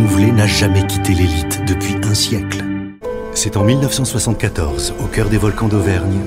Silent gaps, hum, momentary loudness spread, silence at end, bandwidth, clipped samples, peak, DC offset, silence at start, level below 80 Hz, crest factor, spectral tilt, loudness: none; none; 8 LU; 0 s; 16 kHz; under 0.1%; 0 dBFS; under 0.1%; 0 s; -28 dBFS; 14 dB; -5 dB/octave; -16 LUFS